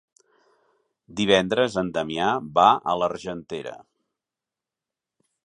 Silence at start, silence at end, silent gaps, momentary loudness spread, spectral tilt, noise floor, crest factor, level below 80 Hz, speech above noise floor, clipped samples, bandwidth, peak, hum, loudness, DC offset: 1.1 s; 1.7 s; none; 16 LU; -4.5 dB/octave; -89 dBFS; 22 dB; -60 dBFS; 66 dB; under 0.1%; 10.5 kHz; -4 dBFS; none; -22 LUFS; under 0.1%